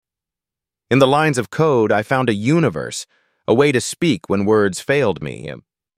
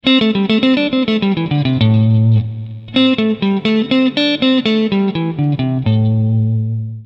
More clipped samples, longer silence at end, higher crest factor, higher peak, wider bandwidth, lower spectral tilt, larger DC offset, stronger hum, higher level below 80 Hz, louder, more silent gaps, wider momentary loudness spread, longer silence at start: neither; first, 0.4 s vs 0 s; about the same, 16 dB vs 14 dB; about the same, -2 dBFS vs 0 dBFS; first, 15 kHz vs 6 kHz; second, -5.5 dB/octave vs -8 dB/octave; neither; neither; second, -54 dBFS vs -48 dBFS; second, -17 LUFS vs -14 LUFS; neither; first, 14 LU vs 5 LU; first, 0.9 s vs 0.05 s